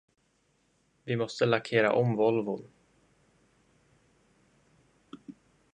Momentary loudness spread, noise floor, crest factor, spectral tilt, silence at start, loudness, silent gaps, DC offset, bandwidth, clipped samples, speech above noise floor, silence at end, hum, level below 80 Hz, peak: 24 LU; -71 dBFS; 24 dB; -6.5 dB/octave; 1.05 s; -28 LUFS; none; under 0.1%; 9.4 kHz; under 0.1%; 44 dB; 0.45 s; none; -74 dBFS; -10 dBFS